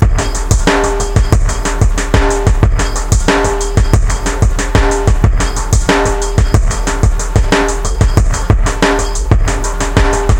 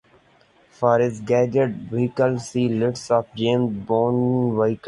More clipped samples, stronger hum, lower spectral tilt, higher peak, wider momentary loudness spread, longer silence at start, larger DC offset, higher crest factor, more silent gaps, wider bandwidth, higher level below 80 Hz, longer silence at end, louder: first, 0.2% vs under 0.1%; neither; second, -5 dB/octave vs -7 dB/octave; first, 0 dBFS vs -4 dBFS; about the same, 3 LU vs 5 LU; second, 0 s vs 0.8 s; first, 0.2% vs under 0.1%; second, 10 dB vs 18 dB; neither; first, 16.5 kHz vs 11 kHz; first, -14 dBFS vs -58 dBFS; about the same, 0 s vs 0 s; first, -13 LUFS vs -21 LUFS